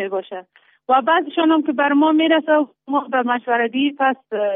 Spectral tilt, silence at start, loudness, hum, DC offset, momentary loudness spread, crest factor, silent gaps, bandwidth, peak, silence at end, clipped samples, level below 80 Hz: -1 dB/octave; 0 s; -18 LUFS; none; under 0.1%; 10 LU; 14 dB; none; 3.8 kHz; -4 dBFS; 0 s; under 0.1%; -74 dBFS